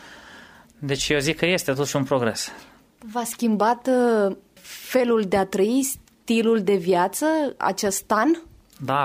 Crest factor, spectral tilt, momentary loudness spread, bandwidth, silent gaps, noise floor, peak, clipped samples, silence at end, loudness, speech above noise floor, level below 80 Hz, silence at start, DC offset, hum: 16 dB; -4.5 dB/octave; 12 LU; 16 kHz; none; -47 dBFS; -6 dBFS; under 0.1%; 0 s; -22 LUFS; 26 dB; -56 dBFS; 0 s; under 0.1%; none